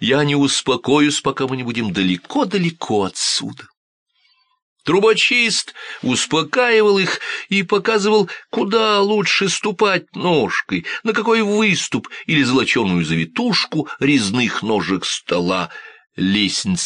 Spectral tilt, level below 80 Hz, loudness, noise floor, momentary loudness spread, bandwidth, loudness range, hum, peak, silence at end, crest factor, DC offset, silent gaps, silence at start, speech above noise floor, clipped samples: -4 dB/octave; -56 dBFS; -17 LUFS; -60 dBFS; 7 LU; 10 kHz; 3 LU; none; -2 dBFS; 0 s; 16 dB; under 0.1%; 3.77-4.06 s, 4.62-4.76 s; 0 s; 43 dB; under 0.1%